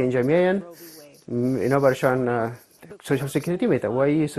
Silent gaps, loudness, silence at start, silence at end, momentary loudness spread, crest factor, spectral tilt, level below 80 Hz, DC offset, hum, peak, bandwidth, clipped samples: none; -23 LUFS; 0 s; 0 s; 21 LU; 18 dB; -7 dB/octave; -58 dBFS; under 0.1%; none; -4 dBFS; 13.5 kHz; under 0.1%